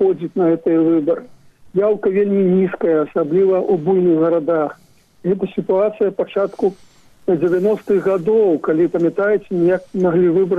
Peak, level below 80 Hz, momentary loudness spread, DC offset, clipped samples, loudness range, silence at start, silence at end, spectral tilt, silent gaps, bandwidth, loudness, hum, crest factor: -8 dBFS; -58 dBFS; 6 LU; under 0.1%; under 0.1%; 3 LU; 0 s; 0 s; -9.5 dB/octave; none; 4.8 kHz; -17 LUFS; none; 8 dB